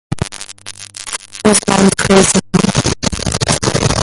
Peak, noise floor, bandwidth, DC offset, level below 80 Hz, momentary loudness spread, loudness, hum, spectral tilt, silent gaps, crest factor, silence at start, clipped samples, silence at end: 0 dBFS; -32 dBFS; 11.5 kHz; under 0.1%; -32 dBFS; 18 LU; -13 LUFS; none; -4 dB/octave; none; 14 dB; 0.1 s; under 0.1%; 0 s